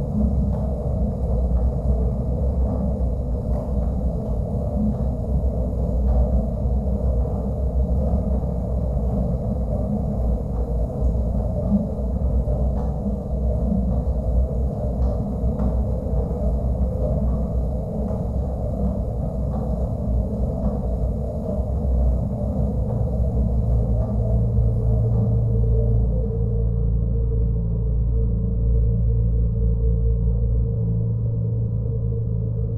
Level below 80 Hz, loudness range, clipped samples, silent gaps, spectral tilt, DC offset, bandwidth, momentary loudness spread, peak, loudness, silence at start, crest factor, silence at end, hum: -24 dBFS; 3 LU; under 0.1%; none; -12 dB/octave; under 0.1%; 1.5 kHz; 4 LU; -8 dBFS; -23 LUFS; 0 s; 12 dB; 0 s; none